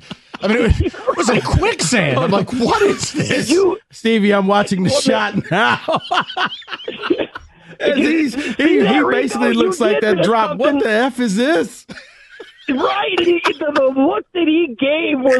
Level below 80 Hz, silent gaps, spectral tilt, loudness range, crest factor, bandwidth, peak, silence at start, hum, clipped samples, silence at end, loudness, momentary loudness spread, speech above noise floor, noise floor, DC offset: -36 dBFS; none; -5 dB/octave; 3 LU; 14 dB; 12.5 kHz; -2 dBFS; 0.1 s; none; under 0.1%; 0 s; -16 LUFS; 7 LU; 24 dB; -40 dBFS; under 0.1%